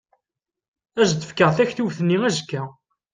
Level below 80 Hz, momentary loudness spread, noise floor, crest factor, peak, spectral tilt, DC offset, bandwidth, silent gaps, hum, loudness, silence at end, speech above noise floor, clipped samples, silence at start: -58 dBFS; 13 LU; -86 dBFS; 20 dB; -4 dBFS; -5 dB/octave; under 0.1%; 9.8 kHz; none; none; -21 LUFS; 0.4 s; 65 dB; under 0.1%; 0.95 s